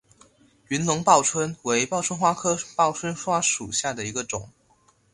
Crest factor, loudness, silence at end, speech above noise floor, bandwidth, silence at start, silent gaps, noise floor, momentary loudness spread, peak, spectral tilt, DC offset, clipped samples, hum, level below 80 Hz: 22 dB; -23 LUFS; 0.65 s; 38 dB; 11.5 kHz; 0.7 s; none; -62 dBFS; 11 LU; -4 dBFS; -3 dB/octave; under 0.1%; under 0.1%; none; -60 dBFS